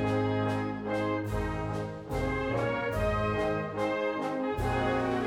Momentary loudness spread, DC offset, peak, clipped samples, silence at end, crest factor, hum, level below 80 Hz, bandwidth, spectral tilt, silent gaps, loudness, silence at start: 4 LU; under 0.1%; -18 dBFS; under 0.1%; 0 s; 12 dB; none; -44 dBFS; 16 kHz; -7 dB/octave; none; -31 LUFS; 0 s